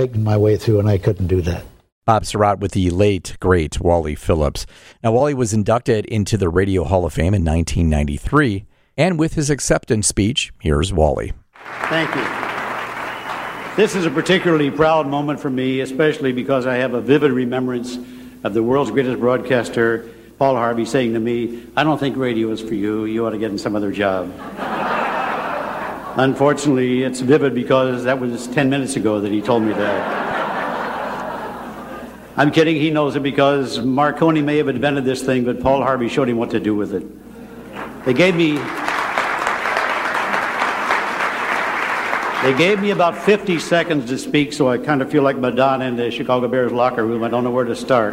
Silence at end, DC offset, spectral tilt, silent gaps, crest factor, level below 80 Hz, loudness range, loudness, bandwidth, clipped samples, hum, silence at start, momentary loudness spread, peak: 0 s; under 0.1%; -5.5 dB/octave; 1.92-2.01 s; 16 dB; -36 dBFS; 3 LU; -18 LUFS; 16 kHz; under 0.1%; none; 0 s; 9 LU; -2 dBFS